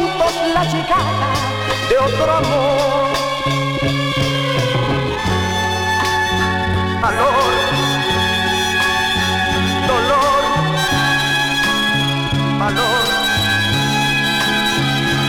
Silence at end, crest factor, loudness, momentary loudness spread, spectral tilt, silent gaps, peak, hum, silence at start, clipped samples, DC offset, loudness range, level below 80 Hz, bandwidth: 0 s; 14 dB; -16 LUFS; 3 LU; -4 dB/octave; none; -2 dBFS; none; 0 s; under 0.1%; under 0.1%; 2 LU; -36 dBFS; 18 kHz